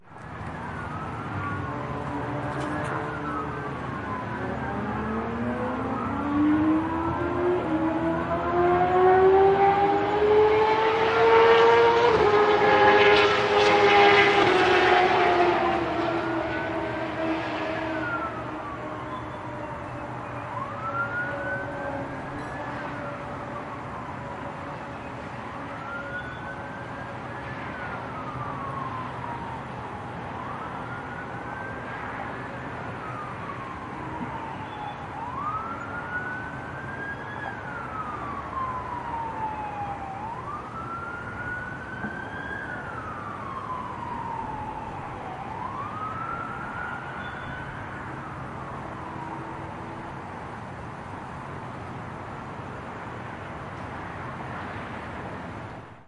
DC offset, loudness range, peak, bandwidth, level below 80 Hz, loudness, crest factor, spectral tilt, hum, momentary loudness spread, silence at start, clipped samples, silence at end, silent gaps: under 0.1%; 17 LU; -4 dBFS; 11 kHz; -52 dBFS; -26 LUFS; 22 dB; -6 dB/octave; none; 17 LU; 0.05 s; under 0.1%; 0.05 s; none